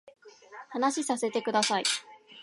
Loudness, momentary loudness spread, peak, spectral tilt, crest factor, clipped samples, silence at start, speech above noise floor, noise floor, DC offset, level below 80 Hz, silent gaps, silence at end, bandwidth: -29 LUFS; 16 LU; -12 dBFS; -2 dB/octave; 20 dB; under 0.1%; 0.05 s; 21 dB; -49 dBFS; under 0.1%; -84 dBFS; none; 0 s; 11.5 kHz